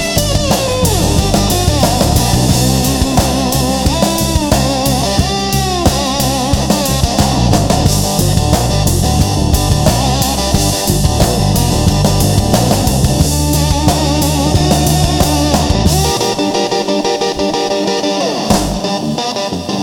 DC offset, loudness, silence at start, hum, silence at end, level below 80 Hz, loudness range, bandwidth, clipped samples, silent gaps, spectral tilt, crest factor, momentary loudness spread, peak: under 0.1%; -12 LUFS; 0 s; none; 0 s; -22 dBFS; 1 LU; 19 kHz; under 0.1%; none; -4.5 dB/octave; 12 dB; 3 LU; 0 dBFS